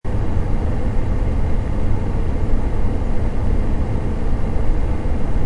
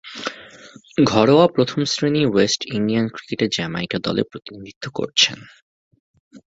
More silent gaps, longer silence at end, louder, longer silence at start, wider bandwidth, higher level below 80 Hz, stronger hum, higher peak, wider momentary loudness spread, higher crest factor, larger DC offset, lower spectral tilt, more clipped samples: second, none vs 4.76-4.81 s, 5.62-5.91 s, 6.00-6.14 s, 6.20-6.31 s; second, 0 s vs 0.2 s; second, -23 LUFS vs -19 LUFS; about the same, 0.05 s vs 0.05 s; second, 4.9 kHz vs 8 kHz; first, -20 dBFS vs -56 dBFS; neither; second, -4 dBFS vs 0 dBFS; second, 1 LU vs 16 LU; second, 12 dB vs 20 dB; neither; first, -8.5 dB/octave vs -4.5 dB/octave; neither